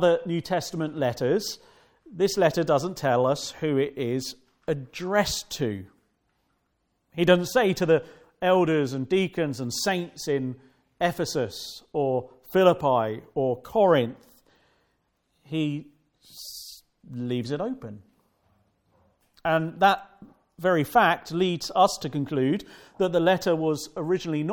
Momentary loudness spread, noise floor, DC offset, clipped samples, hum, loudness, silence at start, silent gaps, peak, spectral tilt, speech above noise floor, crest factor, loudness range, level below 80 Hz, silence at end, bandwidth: 14 LU; -74 dBFS; under 0.1%; under 0.1%; none; -25 LUFS; 0 s; none; -4 dBFS; -5 dB/octave; 49 dB; 22 dB; 9 LU; -60 dBFS; 0 s; 18 kHz